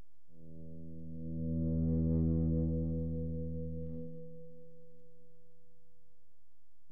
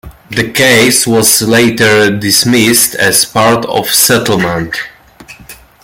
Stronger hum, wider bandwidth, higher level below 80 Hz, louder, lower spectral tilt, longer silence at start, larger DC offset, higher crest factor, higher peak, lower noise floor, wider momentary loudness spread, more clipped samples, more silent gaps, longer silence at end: neither; second, 1.3 kHz vs over 20 kHz; second, -48 dBFS vs -42 dBFS; second, -36 LUFS vs -8 LUFS; first, -14 dB/octave vs -3 dB/octave; first, 0.4 s vs 0.05 s; first, 0.7% vs under 0.1%; first, 16 dB vs 10 dB; second, -22 dBFS vs 0 dBFS; first, -79 dBFS vs -36 dBFS; first, 21 LU vs 9 LU; second, under 0.1% vs 0.2%; neither; first, 2.05 s vs 0.3 s